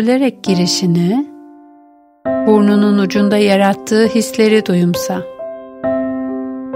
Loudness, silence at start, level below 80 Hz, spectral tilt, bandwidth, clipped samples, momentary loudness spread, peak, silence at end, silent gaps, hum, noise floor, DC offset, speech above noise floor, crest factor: -14 LUFS; 0 s; -54 dBFS; -5.5 dB/octave; 16 kHz; under 0.1%; 12 LU; 0 dBFS; 0 s; none; none; -46 dBFS; under 0.1%; 34 dB; 14 dB